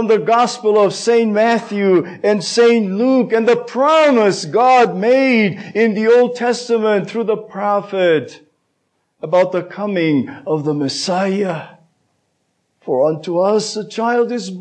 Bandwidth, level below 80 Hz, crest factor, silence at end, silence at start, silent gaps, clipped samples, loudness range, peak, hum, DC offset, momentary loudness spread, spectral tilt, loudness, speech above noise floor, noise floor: 9.4 kHz; -74 dBFS; 12 dB; 0 s; 0 s; none; under 0.1%; 7 LU; -4 dBFS; none; under 0.1%; 8 LU; -5 dB/octave; -15 LUFS; 53 dB; -67 dBFS